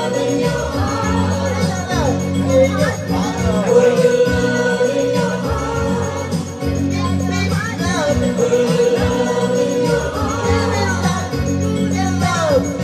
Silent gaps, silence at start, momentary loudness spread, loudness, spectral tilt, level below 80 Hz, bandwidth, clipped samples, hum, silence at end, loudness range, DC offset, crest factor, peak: none; 0 s; 6 LU; -17 LUFS; -5.5 dB/octave; -36 dBFS; 15 kHz; under 0.1%; none; 0 s; 3 LU; under 0.1%; 16 dB; 0 dBFS